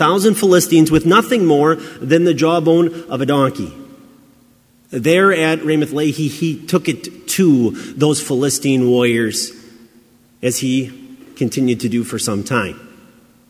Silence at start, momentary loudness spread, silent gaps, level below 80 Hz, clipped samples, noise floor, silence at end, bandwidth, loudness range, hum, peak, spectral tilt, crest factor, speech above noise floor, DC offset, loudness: 0 s; 10 LU; none; -50 dBFS; under 0.1%; -52 dBFS; 0.6 s; 16 kHz; 7 LU; none; 0 dBFS; -5 dB/octave; 16 dB; 37 dB; under 0.1%; -15 LUFS